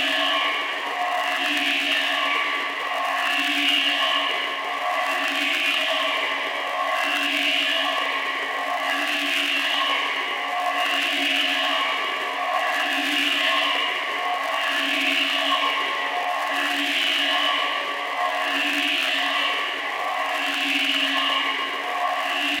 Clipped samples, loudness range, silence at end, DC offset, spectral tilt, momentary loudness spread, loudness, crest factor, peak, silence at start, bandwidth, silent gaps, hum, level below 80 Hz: under 0.1%; 1 LU; 0 s; under 0.1%; 0.5 dB/octave; 5 LU; -21 LUFS; 16 dB; -8 dBFS; 0 s; 17 kHz; none; none; -76 dBFS